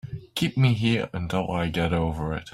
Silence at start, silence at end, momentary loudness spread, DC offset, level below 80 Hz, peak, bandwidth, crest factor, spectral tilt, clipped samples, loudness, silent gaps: 0.05 s; 0.05 s; 6 LU; under 0.1%; -44 dBFS; -8 dBFS; 14.5 kHz; 16 dB; -6.5 dB/octave; under 0.1%; -25 LUFS; none